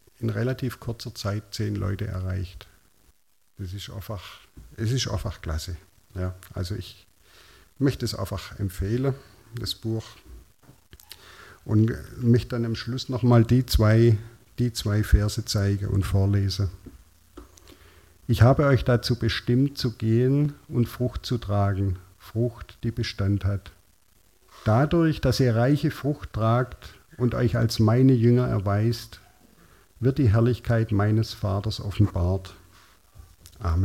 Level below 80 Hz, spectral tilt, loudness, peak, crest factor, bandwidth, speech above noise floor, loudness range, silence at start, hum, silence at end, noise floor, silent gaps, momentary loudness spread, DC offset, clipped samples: -40 dBFS; -7 dB/octave; -25 LUFS; -4 dBFS; 20 dB; 15.5 kHz; 41 dB; 10 LU; 0.2 s; none; 0 s; -65 dBFS; none; 15 LU; under 0.1%; under 0.1%